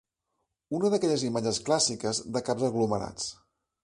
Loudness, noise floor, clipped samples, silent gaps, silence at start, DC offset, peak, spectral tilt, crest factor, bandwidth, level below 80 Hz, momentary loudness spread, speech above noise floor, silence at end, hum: -28 LUFS; -81 dBFS; under 0.1%; none; 0.7 s; under 0.1%; -12 dBFS; -4 dB/octave; 18 dB; 11.5 kHz; -62 dBFS; 10 LU; 53 dB; 0.5 s; none